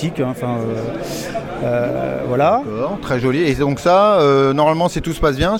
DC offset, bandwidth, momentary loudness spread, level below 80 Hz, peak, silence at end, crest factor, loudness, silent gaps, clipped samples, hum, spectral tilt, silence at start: under 0.1%; 17 kHz; 11 LU; -36 dBFS; -2 dBFS; 0 s; 14 dB; -17 LUFS; none; under 0.1%; none; -6.5 dB/octave; 0 s